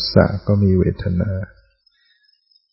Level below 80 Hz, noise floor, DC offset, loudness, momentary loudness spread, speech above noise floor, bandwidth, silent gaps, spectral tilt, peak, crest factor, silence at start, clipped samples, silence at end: -38 dBFS; -60 dBFS; under 0.1%; -18 LUFS; 11 LU; 44 dB; 5.8 kHz; none; -10.5 dB/octave; 0 dBFS; 20 dB; 0 s; under 0.1%; 1.25 s